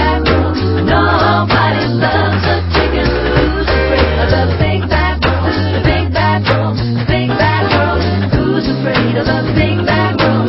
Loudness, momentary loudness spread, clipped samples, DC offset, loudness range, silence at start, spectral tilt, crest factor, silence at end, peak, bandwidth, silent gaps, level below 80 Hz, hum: -13 LUFS; 3 LU; under 0.1%; under 0.1%; 1 LU; 0 s; -9.5 dB/octave; 12 dB; 0 s; 0 dBFS; 5.8 kHz; none; -20 dBFS; none